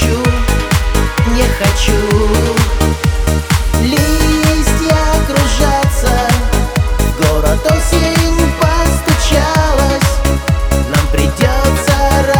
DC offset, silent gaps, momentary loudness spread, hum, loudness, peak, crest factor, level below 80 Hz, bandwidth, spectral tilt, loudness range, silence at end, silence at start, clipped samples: 0.2%; none; 3 LU; none; -12 LUFS; 0 dBFS; 10 dB; -14 dBFS; over 20 kHz; -5 dB/octave; 1 LU; 0 s; 0 s; under 0.1%